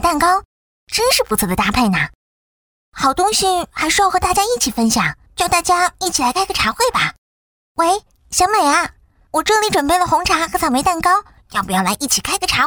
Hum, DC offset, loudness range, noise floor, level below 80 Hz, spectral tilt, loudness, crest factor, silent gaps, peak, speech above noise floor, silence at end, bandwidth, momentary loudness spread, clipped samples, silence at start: none; under 0.1%; 2 LU; under -90 dBFS; -38 dBFS; -2.5 dB/octave; -16 LUFS; 16 dB; 0.45-0.87 s, 2.15-2.92 s, 7.18-7.75 s; 0 dBFS; over 74 dB; 0 s; over 20 kHz; 7 LU; under 0.1%; 0 s